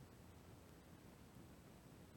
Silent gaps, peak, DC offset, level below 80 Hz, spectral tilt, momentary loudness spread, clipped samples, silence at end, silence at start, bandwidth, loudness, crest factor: none; -48 dBFS; under 0.1%; -74 dBFS; -5.5 dB/octave; 1 LU; under 0.1%; 0 s; 0 s; 18 kHz; -63 LUFS; 14 dB